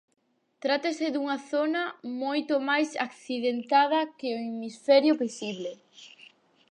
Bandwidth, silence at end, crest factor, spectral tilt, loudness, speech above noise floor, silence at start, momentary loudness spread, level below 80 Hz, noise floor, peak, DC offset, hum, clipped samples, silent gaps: 10.5 kHz; 0.65 s; 18 dB; -4 dB/octave; -27 LUFS; 30 dB; 0.65 s; 12 LU; -86 dBFS; -57 dBFS; -10 dBFS; under 0.1%; none; under 0.1%; none